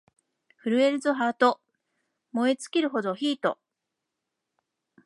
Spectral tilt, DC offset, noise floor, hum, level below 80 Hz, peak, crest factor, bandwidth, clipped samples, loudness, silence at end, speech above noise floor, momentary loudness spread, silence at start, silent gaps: -4.5 dB/octave; under 0.1%; -84 dBFS; none; -84 dBFS; -8 dBFS; 22 dB; 11.5 kHz; under 0.1%; -26 LUFS; 1.5 s; 60 dB; 12 LU; 0.65 s; none